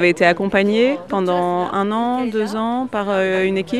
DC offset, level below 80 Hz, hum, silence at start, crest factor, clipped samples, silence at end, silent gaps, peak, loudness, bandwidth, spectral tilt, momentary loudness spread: 0.3%; -56 dBFS; none; 0 s; 16 dB; under 0.1%; 0 s; none; 0 dBFS; -18 LUFS; 12.5 kHz; -6 dB/octave; 6 LU